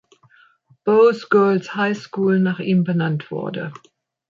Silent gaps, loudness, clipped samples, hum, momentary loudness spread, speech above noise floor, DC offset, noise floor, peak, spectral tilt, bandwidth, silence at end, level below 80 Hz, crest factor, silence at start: none; -19 LUFS; under 0.1%; none; 13 LU; 37 dB; under 0.1%; -55 dBFS; -4 dBFS; -8 dB/octave; 7.4 kHz; 0.55 s; -68 dBFS; 16 dB; 0.85 s